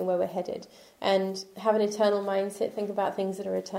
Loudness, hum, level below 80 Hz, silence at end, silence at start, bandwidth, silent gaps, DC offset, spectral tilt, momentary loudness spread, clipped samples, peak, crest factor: -29 LUFS; none; -74 dBFS; 0 s; 0 s; 16 kHz; none; under 0.1%; -5 dB/octave; 8 LU; under 0.1%; -10 dBFS; 18 dB